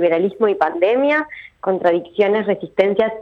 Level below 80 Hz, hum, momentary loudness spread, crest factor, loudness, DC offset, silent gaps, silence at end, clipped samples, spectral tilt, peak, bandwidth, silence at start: -60 dBFS; none; 5 LU; 14 dB; -18 LUFS; under 0.1%; none; 0 s; under 0.1%; -7.5 dB/octave; -4 dBFS; 6 kHz; 0 s